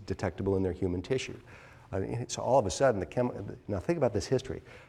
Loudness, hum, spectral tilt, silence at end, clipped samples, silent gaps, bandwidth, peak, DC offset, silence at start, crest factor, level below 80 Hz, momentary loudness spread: -31 LUFS; none; -6 dB/octave; 0.05 s; under 0.1%; none; 12.5 kHz; -12 dBFS; under 0.1%; 0 s; 20 dB; -54 dBFS; 11 LU